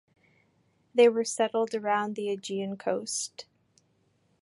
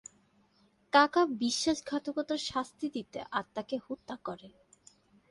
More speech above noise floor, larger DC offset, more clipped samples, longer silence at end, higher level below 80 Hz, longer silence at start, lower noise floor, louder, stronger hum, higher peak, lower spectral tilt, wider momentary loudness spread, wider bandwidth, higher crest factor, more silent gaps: first, 42 dB vs 37 dB; neither; neither; first, 1 s vs 0.8 s; second, -82 dBFS vs -68 dBFS; about the same, 0.95 s vs 0.95 s; about the same, -70 dBFS vs -68 dBFS; first, -28 LUFS vs -32 LUFS; neither; about the same, -8 dBFS vs -10 dBFS; about the same, -3.5 dB/octave vs -3 dB/octave; second, 11 LU vs 16 LU; about the same, 11.5 kHz vs 11.5 kHz; about the same, 20 dB vs 24 dB; neither